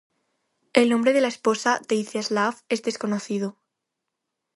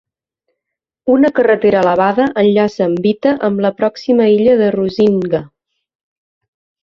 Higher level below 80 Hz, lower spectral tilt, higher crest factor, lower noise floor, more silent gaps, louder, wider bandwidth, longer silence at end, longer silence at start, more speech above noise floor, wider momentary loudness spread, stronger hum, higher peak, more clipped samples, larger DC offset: second, -74 dBFS vs -54 dBFS; second, -4 dB/octave vs -7.5 dB/octave; first, 22 dB vs 12 dB; about the same, -82 dBFS vs -80 dBFS; neither; second, -23 LUFS vs -13 LUFS; first, 11.5 kHz vs 7 kHz; second, 1.05 s vs 1.35 s; second, 0.75 s vs 1.05 s; second, 59 dB vs 68 dB; about the same, 8 LU vs 6 LU; neither; about the same, -2 dBFS vs -2 dBFS; neither; neither